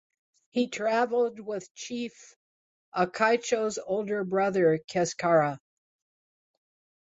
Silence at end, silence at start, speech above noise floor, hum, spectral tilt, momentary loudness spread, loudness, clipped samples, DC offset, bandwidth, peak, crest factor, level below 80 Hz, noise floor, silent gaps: 1.45 s; 0.55 s; over 63 dB; none; -4.5 dB/octave; 12 LU; -28 LUFS; under 0.1%; under 0.1%; 8 kHz; -10 dBFS; 20 dB; -72 dBFS; under -90 dBFS; 1.71-1.75 s, 2.36-2.92 s, 4.84-4.88 s